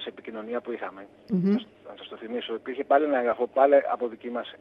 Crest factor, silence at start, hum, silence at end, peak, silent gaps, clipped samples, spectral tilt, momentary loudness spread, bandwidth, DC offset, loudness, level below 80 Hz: 20 dB; 0 s; none; 0.05 s; -8 dBFS; none; under 0.1%; -9 dB/octave; 20 LU; 5.6 kHz; under 0.1%; -26 LUFS; -74 dBFS